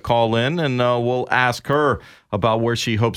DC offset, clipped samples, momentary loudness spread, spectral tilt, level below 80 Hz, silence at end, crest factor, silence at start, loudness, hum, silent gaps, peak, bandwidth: under 0.1%; under 0.1%; 4 LU; -5.5 dB/octave; -48 dBFS; 0 s; 18 dB; 0.05 s; -19 LUFS; none; none; -2 dBFS; 15 kHz